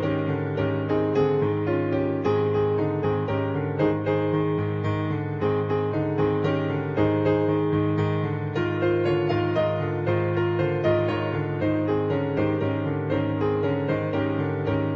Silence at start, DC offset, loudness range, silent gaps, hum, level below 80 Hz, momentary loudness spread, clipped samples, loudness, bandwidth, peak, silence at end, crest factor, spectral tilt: 0 s; under 0.1%; 1 LU; none; none; -52 dBFS; 4 LU; under 0.1%; -24 LUFS; 6.2 kHz; -10 dBFS; 0 s; 12 dB; -9.5 dB/octave